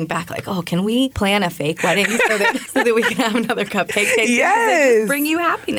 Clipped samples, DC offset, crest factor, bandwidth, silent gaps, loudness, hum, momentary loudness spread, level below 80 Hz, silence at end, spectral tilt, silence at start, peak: under 0.1%; under 0.1%; 12 dB; over 20 kHz; none; -17 LUFS; none; 7 LU; -50 dBFS; 0 s; -4 dB/octave; 0 s; -6 dBFS